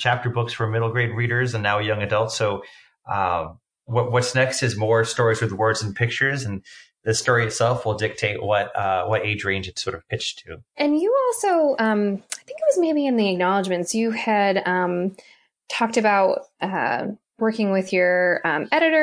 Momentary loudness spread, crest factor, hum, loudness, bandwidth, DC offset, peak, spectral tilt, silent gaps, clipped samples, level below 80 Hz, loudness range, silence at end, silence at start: 8 LU; 16 dB; none; -22 LUFS; 10.5 kHz; under 0.1%; -4 dBFS; -5 dB/octave; none; under 0.1%; -58 dBFS; 2 LU; 0 s; 0 s